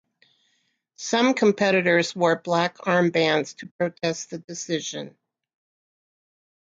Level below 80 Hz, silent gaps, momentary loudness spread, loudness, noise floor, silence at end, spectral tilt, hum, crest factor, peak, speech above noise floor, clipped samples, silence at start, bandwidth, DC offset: -72 dBFS; 3.71-3.79 s, 4.44-4.48 s; 15 LU; -23 LUFS; -71 dBFS; 1.5 s; -4.5 dB/octave; none; 18 dB; -6 dBFS; 48 dB; under 0.1%; 1 s; 9 kHz; under 0.1%